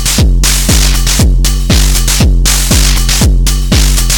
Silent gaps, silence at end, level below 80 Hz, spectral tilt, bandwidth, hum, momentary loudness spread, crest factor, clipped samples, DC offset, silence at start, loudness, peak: none; 0 s; -8 dBFS; -3 dB/octave; 18 kHz; none; 2 LU; 8 dB; under 0.1%; under 0.1%; 0 s; -9 LUFS; 0 dBFS